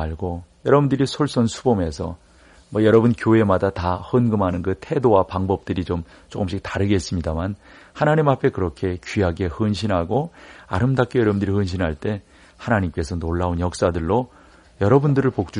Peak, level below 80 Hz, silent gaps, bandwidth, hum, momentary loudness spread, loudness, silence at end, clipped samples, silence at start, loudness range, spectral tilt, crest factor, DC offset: -2 dBFS; -40 dBFS; none; 10.5 kHz; none; 11 LU; -21 LUFS; 0 s; under 0.1%; 0 s; 4 LU; -7 dB/octave; 18 dB; under 0.1%